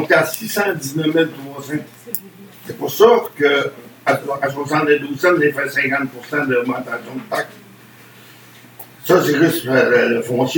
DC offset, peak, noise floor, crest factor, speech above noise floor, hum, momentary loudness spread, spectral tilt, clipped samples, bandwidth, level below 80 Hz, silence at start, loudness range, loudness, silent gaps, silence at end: under 0.1%; 0 dBFS; -43 dBFS; 18 dB; 26 dB; none; 14 LU; -5 dB/octave; under 0.1%; 19 kHz; -66 dBFS; 0 s; 5 LU; -17 LUFS; none; 0 s